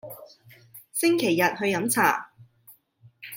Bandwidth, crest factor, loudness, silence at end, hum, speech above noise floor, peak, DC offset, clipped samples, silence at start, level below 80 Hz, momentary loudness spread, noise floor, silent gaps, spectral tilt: 16.5 kHz; 22 dB; -23 LUFS; 0 s; none; 34 dB; -6 dBFS; under 0.1%; under 0.1%; 0.05 s; -74 dBFS; 21 LU; -57 dBFS; none; -3.5 dB/octave